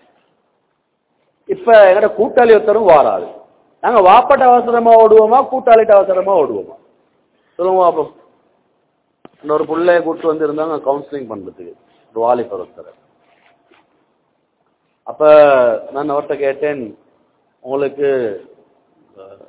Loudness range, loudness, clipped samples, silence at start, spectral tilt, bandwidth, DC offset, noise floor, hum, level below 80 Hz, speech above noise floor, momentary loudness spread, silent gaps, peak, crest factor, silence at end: 12 LU; -12 LUFS; 0.6%; 1.5 s; -9 dB/octave; 4 kHz; under 0.1%; -66 dBFS; none; -56 dBFS; 54 dB; 19 LU; none; 0 dBFS; 14 dB; 1.1 s